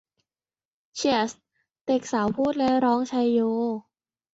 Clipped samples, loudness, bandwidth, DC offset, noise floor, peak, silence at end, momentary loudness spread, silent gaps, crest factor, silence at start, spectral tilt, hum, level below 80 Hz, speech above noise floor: under 0.1%; -24 LUFS; 8 kHz; under 0.1%; under -90 dBFS; -10 dBFS; 0.55 s; 9 LU; 1.81-1.85 s; 16 dB; 0.95 s; -4.5 dB/octave; none; -64 dBFS; over 67 dB